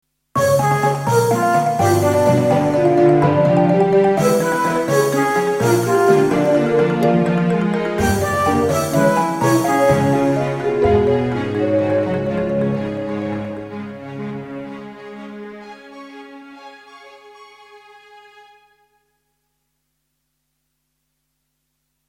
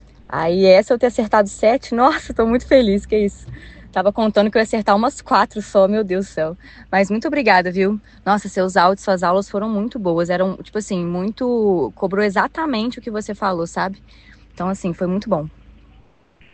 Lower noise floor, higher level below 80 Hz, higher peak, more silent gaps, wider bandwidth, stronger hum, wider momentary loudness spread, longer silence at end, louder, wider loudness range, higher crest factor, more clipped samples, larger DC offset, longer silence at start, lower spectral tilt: first, -72 dBFS vs -52 dBFS; about the same, -44 dBFS vs -44 dBFS; about the same, -2 dBFS vs 0 dBFS; neither; first, 17 kHz vs 9 kHz; neither; first, 17 LU vs 10 LU; first, 4.3 s vs 1.05 s; about the same, -16 LUFS vs -18 LUFS; first, 18 LU vs 6 LU; about the same, 16 dB vs 18 dB; neither; neither; about the same, 0.35 s vs 0.3 s; about the same, -6.5 dB/octave vs -6 dB/octave